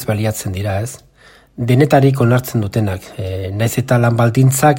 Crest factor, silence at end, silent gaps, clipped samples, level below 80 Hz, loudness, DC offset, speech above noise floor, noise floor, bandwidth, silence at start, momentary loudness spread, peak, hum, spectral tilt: 14 dB; 0 s; none; under 0.1%; -46 dBFS; -15 LUFS; under 0.1%; 32 dB; -47 dBFS; 16.5 kHz; 0 s; 13 LU; 0 dBFS; none; -6.5 dB/octave